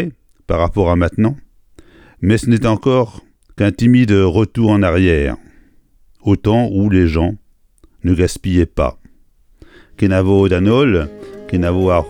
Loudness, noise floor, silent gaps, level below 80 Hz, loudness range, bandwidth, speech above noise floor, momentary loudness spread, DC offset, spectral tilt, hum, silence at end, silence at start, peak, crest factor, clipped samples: -15 LUFS; -50 dBFS; none; -30 dBFS; 3 LU; 11.5 kHz; 37 dB; 10 LU; under 0.1%; -7.5 dB/octave; none; 0 s; 0 s; 0 dBFS; 14 dB; under 0.1%